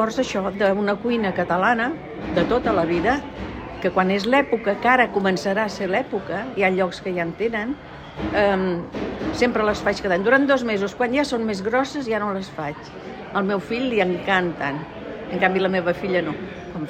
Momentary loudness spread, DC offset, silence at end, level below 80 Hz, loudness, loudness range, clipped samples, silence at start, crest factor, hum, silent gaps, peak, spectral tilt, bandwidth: 12 LU; under 0.1%; 0 s; -46 dBFS; -22 LUFS; 3 LU; under 0.1%; 0 s; 18 dB; none; none; -4 dBFS; -6 dB/octave; 14 kHz